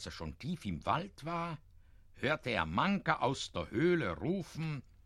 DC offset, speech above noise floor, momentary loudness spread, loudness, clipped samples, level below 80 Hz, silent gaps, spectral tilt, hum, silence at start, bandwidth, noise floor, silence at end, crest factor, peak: under 0.1%; 23 dB; 10 LU; -36 LUFS; under 0.1%; -58 dBFS; none; -6 dB/octave; none; 0 s; 12.5 kHz; -58 dBFS; 0.25 s; 22 dB; -14 dBFS